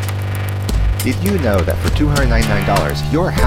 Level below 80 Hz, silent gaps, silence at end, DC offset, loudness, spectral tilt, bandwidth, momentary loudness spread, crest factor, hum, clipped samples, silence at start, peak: -22 dBFS; none; 0 s; under 0.1%; -16 LUFS; -6 dB/octave; 17 kHz; 6 LU; 14 dB; none; under 0.1%; 0 s; -2 dBFS